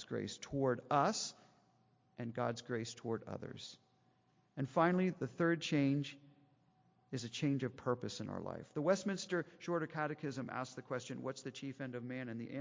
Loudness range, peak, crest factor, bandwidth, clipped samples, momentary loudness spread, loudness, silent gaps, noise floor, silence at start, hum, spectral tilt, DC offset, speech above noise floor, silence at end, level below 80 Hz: 5 LU; -20 dBFS; 20 dB; 7.6 kHz; under 0.1%; 13 LU; -39 LUFS; none; -74 dBFS; 0 s; none; -5.5 dB/octave; under 0.1%; 35 dB; 0 s; -74 dBFS